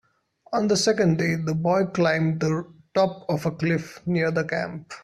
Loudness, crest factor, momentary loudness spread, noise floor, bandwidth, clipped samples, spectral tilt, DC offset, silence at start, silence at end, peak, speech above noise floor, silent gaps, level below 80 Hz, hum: -24 LUFS; 16 dB; 7 LU; -59 dBFS; 13 kHz; under 0.1%; -5.5 dB/octave; under 0.1%; 0.5 s; 0.05 s; -8 dBFS; 36 dB; none; -60 dBFS; none